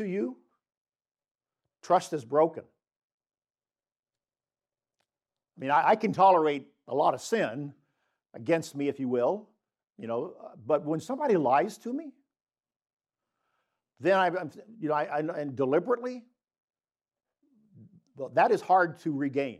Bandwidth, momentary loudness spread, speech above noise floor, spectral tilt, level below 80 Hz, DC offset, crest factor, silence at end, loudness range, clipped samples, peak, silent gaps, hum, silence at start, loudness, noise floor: 14 kHz; 15 LU; over 63 dB; -6 dB/octave; -86 dBFS; under 0.1%; 20 dB; 0.05 s; 6 LU; under 0.1%; -10 dBFS; 0.77-0.85 s, 1.31-1.35 s, 2.96-3.18 s, 12.76-12.80 s, 12.93-12.97 s, 16.64-16.68 s; none; 0 s; -28 LUFS; under -90 dBFS